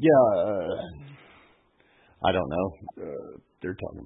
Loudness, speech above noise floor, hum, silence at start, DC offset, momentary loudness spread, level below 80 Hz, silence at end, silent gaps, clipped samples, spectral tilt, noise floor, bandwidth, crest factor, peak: -27 LUFS; 38 dB; none; 0 s; under 0.1%; 21 LU; -58 dBFS; 0 s; none; under 0.1%; -10.5 dB/octave; -63 dBFS; 3.9 kHz; 20 dB; -8 dBFS